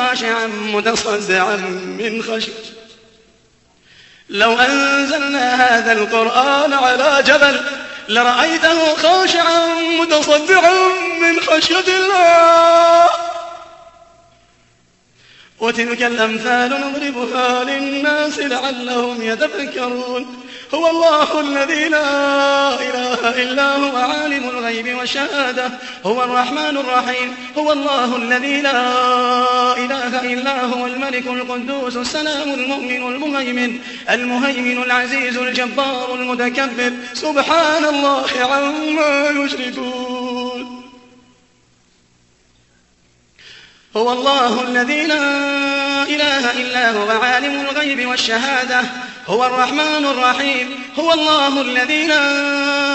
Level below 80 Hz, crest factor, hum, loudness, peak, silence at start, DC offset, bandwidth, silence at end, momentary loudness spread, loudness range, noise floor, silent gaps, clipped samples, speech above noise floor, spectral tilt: -56 dBFS; 16 dB; none; -15 LUFS; 0 dBFS; 0 s; under 0.1%; 8.4 kHz; 0 s; 10 LU; 7 LU; -55 dBFS; none; under 0.1%; 40 dB; -2 dB/octave